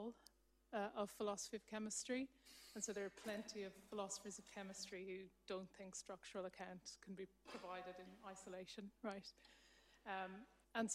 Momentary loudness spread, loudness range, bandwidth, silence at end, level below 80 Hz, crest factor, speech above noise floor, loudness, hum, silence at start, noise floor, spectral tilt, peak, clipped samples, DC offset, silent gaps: 11 LU; 6 LU; 15.5 kHz; 0 s; -80 dBFS; 20 dB; 22 dB; -51 LUFS; none; 0 s; -73 dBFS; -3 dB/octave; -30 dBFS; under 0.1%; under 0.1%; none